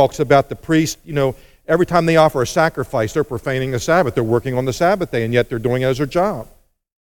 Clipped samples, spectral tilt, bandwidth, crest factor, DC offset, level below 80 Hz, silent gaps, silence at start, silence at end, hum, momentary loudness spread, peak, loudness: under 0.1%; -6 dB/octave; 17.5 kHz; 18 dB; under 0.1%; -42 dBFS; none; 0 s; 0.65 s; none; 7 LU; 0 dBFS; -17 LUFS